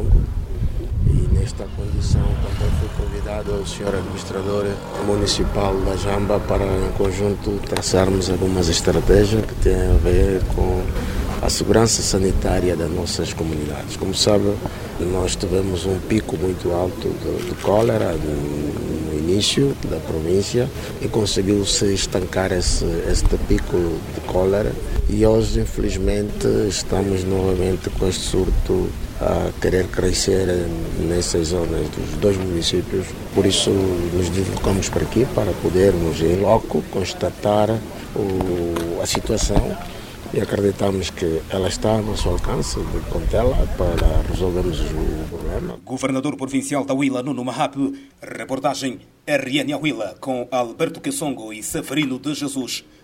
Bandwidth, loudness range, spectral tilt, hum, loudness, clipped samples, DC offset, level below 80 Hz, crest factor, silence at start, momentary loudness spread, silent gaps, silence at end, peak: 16.5 kHz; 4 LU; -5 dB/octave; none; -21 LUFS; under 0.1%; under 0.1%; -26 dBFS; 20 dB; 0 s; 9 LU; none; 0.25 s; 0 dBFS